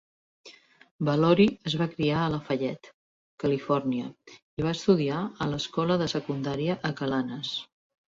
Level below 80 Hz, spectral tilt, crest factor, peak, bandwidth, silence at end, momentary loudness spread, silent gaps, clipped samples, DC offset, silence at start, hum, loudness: -60 dBFS; -6.5 dB/octave; 20 dB; -8 dBFS; 7.8 kHz; 0.55 s; 10 LU; 0.91-0.99 s, 2.94-3.38 s, 4.42-4.57 s; under 0.1%; under 0.1%; 0.45 s; none; -27 LUFS